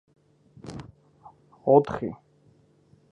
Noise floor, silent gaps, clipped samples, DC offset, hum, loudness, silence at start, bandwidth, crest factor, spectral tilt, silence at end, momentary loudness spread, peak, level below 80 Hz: -60 dBFS; none; under 0.1%; under 0.1%; none; -24 LUFS; 0.65 s; 9.2 kHz; 24 dB; -8.5 dB/octave; 1 s; 25 LU; -4 dBFS; -60 dBFS